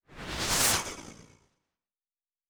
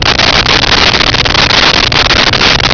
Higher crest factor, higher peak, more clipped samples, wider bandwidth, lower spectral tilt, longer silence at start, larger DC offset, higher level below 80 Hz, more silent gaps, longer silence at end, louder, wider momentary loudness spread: first, 22 dB vs 8 dB; second, -12 dBFS vs 0 dBFS; neither; first, over 20 kHz vs 5.4 kHz; second, -1 dB/octave vs -2.5 dB/octave; about the same, 0.1 s vs 0 s; neither; second, -50 dBFS vs -22 dBFS; neither; first, 1.25 s vs 0 s; second, -27 LUFS vs -5 LUFS; first, 16 LU vs 2 LU